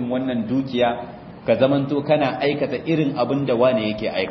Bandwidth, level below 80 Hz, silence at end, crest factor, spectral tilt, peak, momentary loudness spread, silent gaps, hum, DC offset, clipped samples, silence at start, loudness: 6 kHz; -54 dBFS; 0 s; 18 dB; -8.5 dB/octave; -4 dBFS; 6 LU; none; none; under 0.1%; under 0.1%; 0 s; -21 LUFS